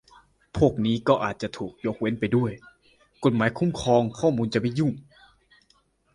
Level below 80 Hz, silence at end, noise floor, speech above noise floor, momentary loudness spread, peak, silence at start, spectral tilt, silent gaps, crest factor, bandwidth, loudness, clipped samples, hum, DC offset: -50 dBFS; 1.15 s; -65 dBFS; 41 dB; 10 LU; -6 dBFS; 0.55 s; -7 dB/octave; none; 20 dB; 11.5 kHz; -25 LUFS; under 0.1%; none; under 0.1%